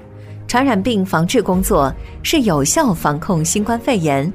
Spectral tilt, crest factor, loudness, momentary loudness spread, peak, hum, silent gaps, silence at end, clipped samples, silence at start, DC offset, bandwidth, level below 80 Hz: -4.5 dB/octave; 14 dB; -16 LUFS; 5 LU; -2 dBFS; none; none; 0 s; under 0.1%; 0 s; under 0.1%; 16 kHz; -34 dBFS